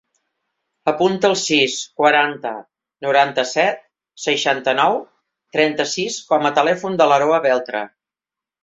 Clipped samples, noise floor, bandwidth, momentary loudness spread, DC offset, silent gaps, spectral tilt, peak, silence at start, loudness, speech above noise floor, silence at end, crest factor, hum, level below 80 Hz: under 0.1%; -89 dBFS; 8 kHz; 12 LU; under 0.1%; none; -3 dB/octave; -2 dBFS; 0.85 s; -18 LUFS; 71 dB; 0.75 s; 18 dB; none; -66 dBFS